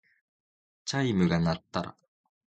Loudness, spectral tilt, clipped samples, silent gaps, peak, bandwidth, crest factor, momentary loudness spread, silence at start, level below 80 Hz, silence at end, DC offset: -29 LUFS; -6 dB/octave; under 0.1%; none; -12 dBFS; 9 kHz; 20 dB; 13 LU; 0.85 s; -52 dBFS; 0.7 s; under 0.1%